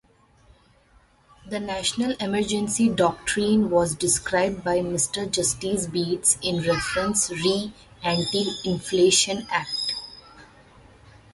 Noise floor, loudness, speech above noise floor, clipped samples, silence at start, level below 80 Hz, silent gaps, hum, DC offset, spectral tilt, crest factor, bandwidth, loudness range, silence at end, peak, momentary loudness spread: -58 dBFS; -23 LUFS; 35 dB; under 0.1%; 1.45 s; -52 dBFS; none; none; under 0.1%; -3 dB/octave; 20 dB; 12 kHz; 2 LU; 0.9 s; -6 dBFS; 8 LU